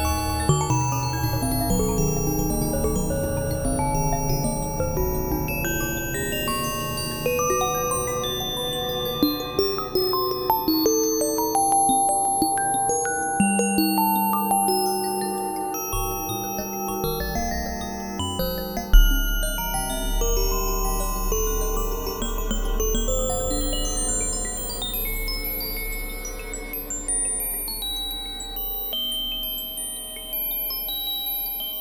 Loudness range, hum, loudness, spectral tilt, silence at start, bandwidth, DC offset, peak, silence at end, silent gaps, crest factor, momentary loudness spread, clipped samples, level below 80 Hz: 5 LU; none; -24 LUFS; -3.5 dB/octave; 0 s; 19 kHz; under 0.1%; -2 dBFS; 0 s; none; 22 dB; 7 LU; under 0.1%; -30 dBFS